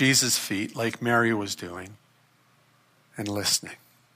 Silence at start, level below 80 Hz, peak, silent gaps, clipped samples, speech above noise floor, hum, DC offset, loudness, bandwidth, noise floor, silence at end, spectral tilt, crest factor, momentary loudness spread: 0 s; -70 dBFS; -8 dBFS; none; under 0.1%; 36 dB; none; under 0.1%; -25 LUFS; 15.5 kHz; -63 dBFS; 0.4 s; -2.5 dB/octave; 20 dB; 20 LU